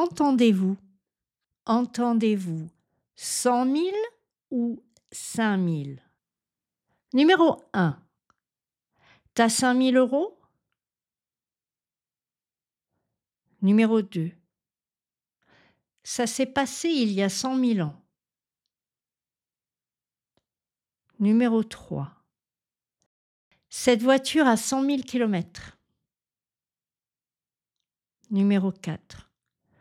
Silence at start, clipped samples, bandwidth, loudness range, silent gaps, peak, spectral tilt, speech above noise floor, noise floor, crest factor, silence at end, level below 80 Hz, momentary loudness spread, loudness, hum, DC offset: 0 s; under 0.1%; 15.5 kHz; 6 LU; 23.06-23.51 s; -4 dBFS; -5 dB/octave; over 67 dB; under -90 dBFS; 22 dB; 0.65 s; -68 dBFS; 15 LU; -24 LUFS; none; under 0.1%